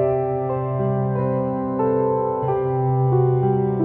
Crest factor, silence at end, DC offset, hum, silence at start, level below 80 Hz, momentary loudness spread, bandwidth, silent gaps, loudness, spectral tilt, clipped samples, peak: 12 dB; 0 s; under 0.1%; none; 0 s; -50 dBFS; 5 LU; 3.1 kHz; none; -21 LUFS; -14 dB/octave; under 0.1%; -8 dBFS